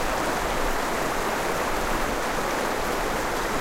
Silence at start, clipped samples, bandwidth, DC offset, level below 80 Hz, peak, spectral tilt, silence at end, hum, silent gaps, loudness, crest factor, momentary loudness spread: 0 s; under 0.1%; 16 kHz; under 0.1%; -34 dBFS; -12 dBFS; -3.5 dB/octave; 0 s; none; none; -26 LUFS; 14 dB; 1 LU